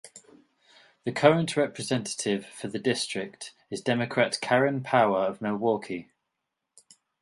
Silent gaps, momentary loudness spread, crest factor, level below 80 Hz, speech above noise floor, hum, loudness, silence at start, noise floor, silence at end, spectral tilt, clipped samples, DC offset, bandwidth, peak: none; 14 LU; 24 dB; -70 dBFS; 57 dB; none; -27 LUFS; 0.05 s; -83 dBFS; 1.2 s; -4.5 dB/octave; under 0.1%; under 0.1%; 11.5 kHz; -4 dBFS